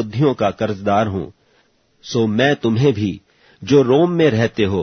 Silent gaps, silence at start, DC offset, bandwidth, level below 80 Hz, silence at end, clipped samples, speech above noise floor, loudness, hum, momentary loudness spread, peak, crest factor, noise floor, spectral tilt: none; 0 s; under 0.1%; 6.6 kHz; -52 dBFS; 0 s; under 0.1%; 42 dB; -17 LUFS; none; 11 LU; -2 dBFS; 16 dB; -58 dBFS; -7 dB/octave